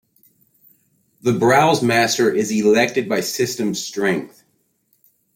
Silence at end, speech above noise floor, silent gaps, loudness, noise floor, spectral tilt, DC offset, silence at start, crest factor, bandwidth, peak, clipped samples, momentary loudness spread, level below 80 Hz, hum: 1.1 s; 48 dB; none; -18 LUFS; -65 dBFS; -4 dB/octave; under 0.1%; 1.25 s; 16 dB; 16.5 kHz; -4 dBFS; under 0.1%; 8 LU; -60 dBFS; none